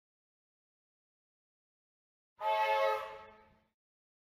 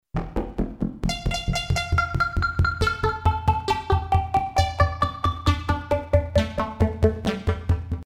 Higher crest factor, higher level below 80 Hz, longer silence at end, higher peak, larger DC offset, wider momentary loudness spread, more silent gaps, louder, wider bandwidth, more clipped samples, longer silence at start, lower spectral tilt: about the same, 18 dB vs 18 dB; second, -80 dBFS vs -30 dBFS; first, 0.95 s vs 0.05 s; second, -22 dBFS vs -4 dBFS; neither; first, 17 LU vs 6 LU; neither; second, -33 LUFS vs -24 LUFS; first, 16.5 kHz vs 12.5 kHz; neither; first, 2.4 s vs 0.15 s; second, -1.5 dB/octave vs -6 dB/octave